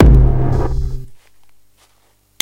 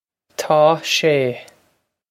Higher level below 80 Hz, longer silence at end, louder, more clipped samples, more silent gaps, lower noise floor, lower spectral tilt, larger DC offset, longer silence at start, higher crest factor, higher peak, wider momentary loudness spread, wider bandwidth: first, -16 dBFS vs -68 dBFS; first, 1.25 s vs 0.7 s; about the same, -16 LUFS vs -16 LUFS; neither; neither; second, -56 dBFS vs -64 dBFS; first, -8.5 dB/octave vs -4 dB/octave; neither; second, 0 s vs 0.4 s; about the same, 14 dB vs 18 dB; about the same, 0 dBFS vs 0 dBFS; about the same, 17 LU vs 18 LU; second, 6.6 kHz vs 16 kHz